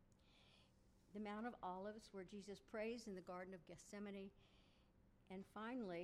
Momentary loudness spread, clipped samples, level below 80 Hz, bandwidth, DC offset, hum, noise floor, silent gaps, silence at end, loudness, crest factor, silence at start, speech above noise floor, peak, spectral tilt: 9 LU; under 0.1%; -78 dBFS; 13.5 kHz; under 0.1%; none; -74 dBFS; none; 0 s; -54 LUFS; 18 dB; 0 s; 21 dB; -36 dBFS; -5.5 dB/octave